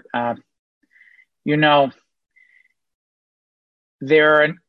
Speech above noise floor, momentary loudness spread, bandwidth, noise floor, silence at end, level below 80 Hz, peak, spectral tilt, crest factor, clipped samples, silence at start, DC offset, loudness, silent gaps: 42 dB; 18 LU; 6 kHz; -59 dBFS; 0.15 s; -68 dBFS; -4 dBFS; -7.5 dB/octave; 18 dB; under 0.1%; 0.15 s; under 0.1%; -17 LUFS; 0.59-0.81 s, 2.94-3.99 s